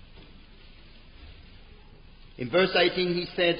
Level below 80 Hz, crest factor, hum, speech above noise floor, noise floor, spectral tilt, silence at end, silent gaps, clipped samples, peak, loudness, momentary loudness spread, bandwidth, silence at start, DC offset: -52 dBFS; 20 dB; none; 25 dB; -50 dBFS; -9 dB/octave; 0 s; none; under 0.1%; -10 dBFS; -25 LUFS; 6 LU; 5.4 kHz; 0.15 s; under 0.1%